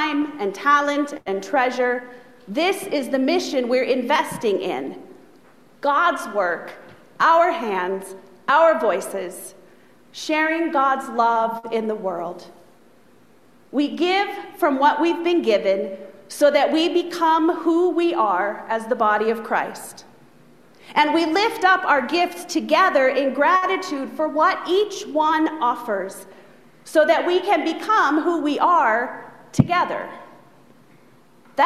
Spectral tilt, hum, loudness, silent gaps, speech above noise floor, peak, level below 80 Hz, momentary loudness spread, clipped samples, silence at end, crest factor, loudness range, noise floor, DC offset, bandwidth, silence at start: -4.5 dB/octave; none; -20 LUFS; none; 34 dB; 0 dBFS; -62 dBFS; 13 LU; under 0.1%; 0 s; 20 dB; 4 LU; -54 dBFS; 0.2%; 14.5 kHz; 0 s